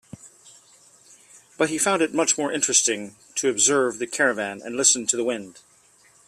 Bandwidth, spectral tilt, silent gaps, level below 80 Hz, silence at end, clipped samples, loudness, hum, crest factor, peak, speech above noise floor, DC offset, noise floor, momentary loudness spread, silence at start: 15 kHz; -1.5 dB/octave; none; -70 dBFS; 0.75 s; under 0.1%; -21 LUFS; none; 22 dB; -4 dBFS; 34 dB; under 0.1%; -57 dBFS; 11 LU; 0.25 s